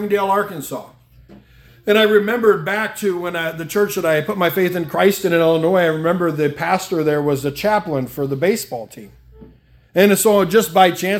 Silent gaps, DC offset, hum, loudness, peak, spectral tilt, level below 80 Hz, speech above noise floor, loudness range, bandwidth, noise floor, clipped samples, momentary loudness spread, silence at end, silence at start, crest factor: none; under 0.1%; none; -17 LUFS; 0 dBFS; -4.5 dB/octave; -54 dBFS; 32 dB; 3 LU; 17.5 kHz; -48 dBFS; under 0.1%; 10 LU; 0 s; 0 s; 18 dB